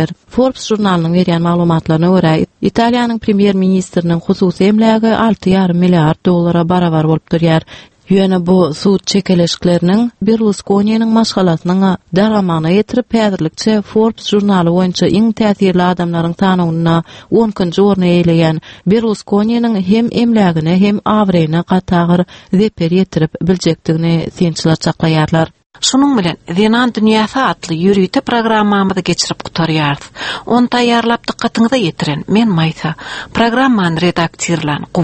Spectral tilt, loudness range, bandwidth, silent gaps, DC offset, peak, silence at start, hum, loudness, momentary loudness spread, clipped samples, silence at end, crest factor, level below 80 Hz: -6 dB/octave; 2 LU; 8.8 kHz; 25.66-25.70 s; under 0.1%; 0 dBFS; 0 s; none; -12 LUFS; 5 LU; under 0.1%; 0 s; 12 dB; -42 dBFS